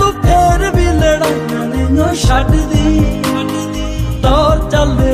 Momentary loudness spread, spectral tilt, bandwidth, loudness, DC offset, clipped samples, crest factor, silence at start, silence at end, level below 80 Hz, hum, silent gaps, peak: 7 LU; -6 dB/octave; 15.5 kHz; -13 LUFS; under 0.1%; under 0.1%; 10 dB; 0 s; 0 s; -18 dBFS; none; none; -2 dBFS